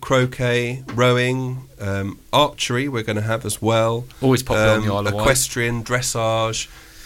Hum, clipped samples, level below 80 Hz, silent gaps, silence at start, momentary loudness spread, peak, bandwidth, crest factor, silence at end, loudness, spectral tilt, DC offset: none; under 0.1%; -40 dBFS; none; 0 s; 9 LU; -2 dBFS; 17 kHz; 18 dB; 0 s; -20 LUFS; -4.5 dB/octave; under 0.1%